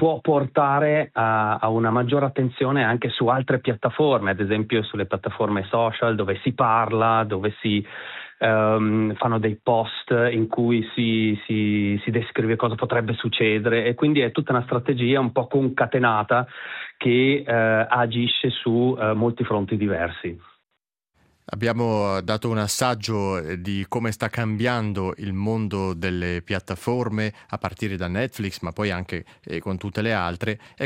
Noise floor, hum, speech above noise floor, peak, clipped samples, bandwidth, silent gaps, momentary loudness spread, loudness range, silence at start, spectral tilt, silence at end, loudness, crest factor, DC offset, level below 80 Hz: -79 dBFS; none; 57 dB; -6 dBFS; under 0.1%; 15.5 kHz; none; 8 LU; 5 LU; 0 s; -6 dB/octave; 0 s; -22 LUFS; 18 dB; under 0.1%; -60 dBFS